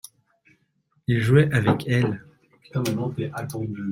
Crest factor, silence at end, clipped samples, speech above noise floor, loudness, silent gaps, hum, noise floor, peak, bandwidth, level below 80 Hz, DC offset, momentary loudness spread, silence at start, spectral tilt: 20 dB; 0 s; under 0.1%; 46 dB; -23 LUFS; none; none; -68 dBFS; -4 dBFS; 16 kHz; -54 dBFS; under 0.1%; 13 LU; 1.1 s; -7 dB/octave